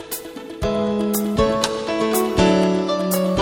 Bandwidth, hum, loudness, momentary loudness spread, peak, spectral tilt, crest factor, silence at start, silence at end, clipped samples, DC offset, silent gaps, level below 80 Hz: 17 kHz; none; -20 LUFS; 10 LU; -2 dBFS; -5 dB/octave; 16 dB; 0 s; 0 s; under 0.1%; under 0.1%; none; -38 dBFS